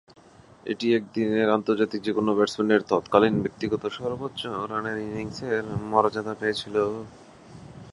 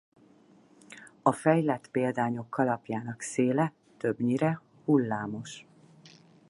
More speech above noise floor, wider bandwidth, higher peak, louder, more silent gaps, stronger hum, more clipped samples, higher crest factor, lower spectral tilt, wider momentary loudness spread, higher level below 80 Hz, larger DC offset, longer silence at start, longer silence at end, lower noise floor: about the same, 28 dB vs 31 dB; about the same, 11.5 kHz vs 11.5 kHz; first, -2 dBFS vs -8 dBFS; first, -25 LUFS vs -29 LUFS; neither; neither; neither; about the same, 22 dB vs 22 dB; about the same, -6 dB/octave vs -6.5 dB/octave; second, 11 LU vs 15 LU; first, -58 dBFS vs -72 dBFS; neither; second, 0.65 s vs 0.9 s; second, 0 s vs 0.9 s; second, -52 dBFS vs -59 dBFS